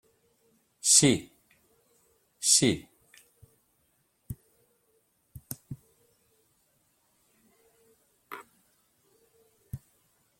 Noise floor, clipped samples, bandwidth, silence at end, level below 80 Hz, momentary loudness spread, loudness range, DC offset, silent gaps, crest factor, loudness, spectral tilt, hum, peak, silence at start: -72 dBFS; under 0.1%; 16.5 kHz; 0.65 s; -62 dBFS; 27 LU; 26 LU; under 0.1%; none; 28 dB; -23 LUFS; -2.5 dB/octave; none; -6 dBFS; 0.85 s